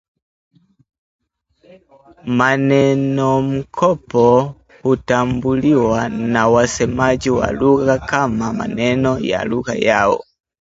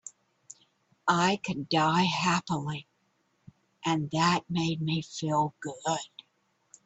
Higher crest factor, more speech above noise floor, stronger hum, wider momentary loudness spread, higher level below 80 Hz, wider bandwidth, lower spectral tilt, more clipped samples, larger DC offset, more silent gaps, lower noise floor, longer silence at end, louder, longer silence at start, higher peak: about the same, 16 dB vs 20 dB; second, 40 dB vs 45 dB; neither; second, 7 LU vs 10 LU; first, -42 dBFS vs -66 dBFS; about the same, 8 kHz vs 8.4 kHz; first, -6 dB/octave vs -4.5 dB/octave; neither; neither; neither; second, -56 dBFS vs -73 dBFS; second, 0.4 s vs 0.8 s; first, -16 LUFS vs -29 LUFS; first, 2.25 s vs 0.05 s; first, 0 dBFS vs -10 dBFS